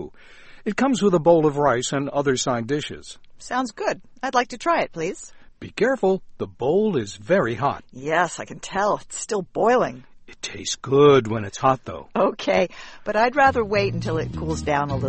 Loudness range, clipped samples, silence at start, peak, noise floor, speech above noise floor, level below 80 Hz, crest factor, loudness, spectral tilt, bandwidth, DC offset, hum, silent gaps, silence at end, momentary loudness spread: 4 LU; under 0.1%; 0 s; -2 dBFS; -44 dBFS; 23 dB; -48 dBFS; 20 dB; -22 LUFS; -5 dB/octave; 8.8 kHz; under 0.1%; none; none; 0 s; 14 LU